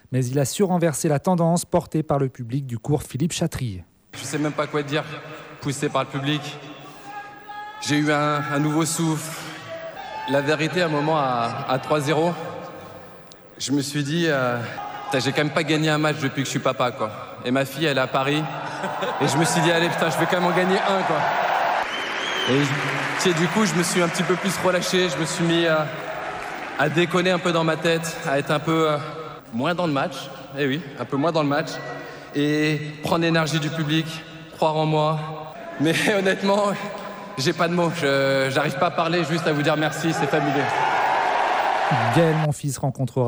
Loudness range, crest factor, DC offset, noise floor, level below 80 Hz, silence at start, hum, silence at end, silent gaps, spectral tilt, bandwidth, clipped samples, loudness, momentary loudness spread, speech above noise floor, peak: 4 LU; 16 dB; under 0.1%; -44 dBFS; -58 dBFS; 0.1 s; none; 0 s; none; -5 dB/octave; over 20 kHz; under 0.1%; -22 LUFS; 13 LU; 22 dB; -6 dBFS